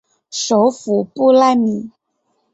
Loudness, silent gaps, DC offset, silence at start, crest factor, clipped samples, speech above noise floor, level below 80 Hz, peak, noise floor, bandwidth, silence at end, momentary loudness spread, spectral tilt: -15 LUFS; none; under 0.1%; 0.3 s; 14 dB; under 0.1%; 53 dB; -62 dBFS; -2 dBFS; -67 dBFS; 8.2 kHz; 0.65 s; 15 LU; -4.5 dB/octave